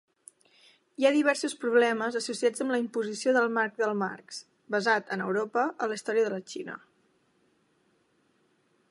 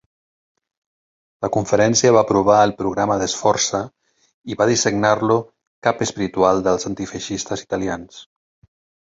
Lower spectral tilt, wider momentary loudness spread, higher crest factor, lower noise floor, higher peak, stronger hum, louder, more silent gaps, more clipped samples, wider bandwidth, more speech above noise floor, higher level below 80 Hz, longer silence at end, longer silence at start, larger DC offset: about the same, -4 dB/octave vs -4 dB/octave; first, 15 LU vs 12 LU; about the same, 20 dB vs 18 dB; second, -70 dBFS vs under -90 dBFS; second, -10 dBFS vs -2 dBFS; neither; second, -28 LUFS vs -18 LUFS; second, none vs 4.34-4.42 s, 5.67-5.82 s; neither; first, 11.5 kHz vs 8 kHz; second, 42 dB vs over 72 dB; second, -84 dBFS vs -50 dBFS; first, 2.15 s vs 0.85 s; second, 1 s vs 1.4 s; neither